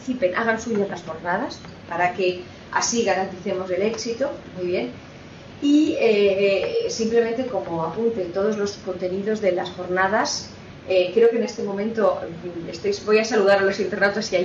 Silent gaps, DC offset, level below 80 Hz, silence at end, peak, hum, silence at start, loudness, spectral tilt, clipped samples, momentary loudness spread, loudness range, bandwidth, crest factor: none; under 0.1%; -56 dBFS; 0 s; -6 dBFS; none; 0 s; -22 LUFS; -4 dB/octave; under 0.1%; 12 LU; 3 LU; 7.8 kHz; 16 dB